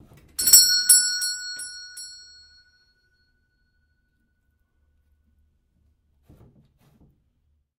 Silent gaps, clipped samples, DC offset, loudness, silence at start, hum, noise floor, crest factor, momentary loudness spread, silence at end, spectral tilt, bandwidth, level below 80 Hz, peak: none; under 0.1%; under 0.1%; -15 LUFS; 0.4 s; none; -70 dBFS; 26 dB; 25 LU; 5.65 s; 3.5 dB/octave; 16 kHz; -62 dBFS; 0 dBFS